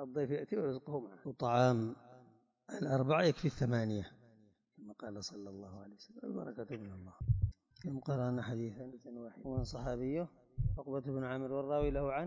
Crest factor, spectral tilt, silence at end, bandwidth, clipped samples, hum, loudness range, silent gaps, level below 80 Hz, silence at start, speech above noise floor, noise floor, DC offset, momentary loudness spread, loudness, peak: 20 dB; -7.5 dB/octave; 0 s; 7.6 kHz; under 0.1%; none; 8 LU; none; -52 dBFS; 0 s; 31 dB; -68 dBFS; under 0.1%; 18 LU; -38 LUFS; -18 dBFS